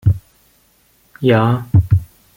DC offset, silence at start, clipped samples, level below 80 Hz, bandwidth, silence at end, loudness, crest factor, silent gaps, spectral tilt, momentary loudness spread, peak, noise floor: under 0.1%; 0.05 s; under 0.1%; -36 dBFS; 16 kHz; 0.35 s; -16 LUFS; 16 dB; none; -9 dB/octave; 6 LU; -2 dBFS; -55 dBFS